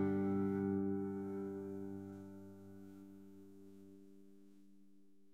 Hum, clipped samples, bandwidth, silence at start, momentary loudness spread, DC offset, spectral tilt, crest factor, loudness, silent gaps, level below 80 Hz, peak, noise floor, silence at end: none; under 0.1%; 7.8 kHz; 0 s; 23 LU; under 0.1%; -10 dB/octave; 16 dB; -41 LUFS; none; -80 dBFS; -28 dBFS; -69 dBFS; 0.3 s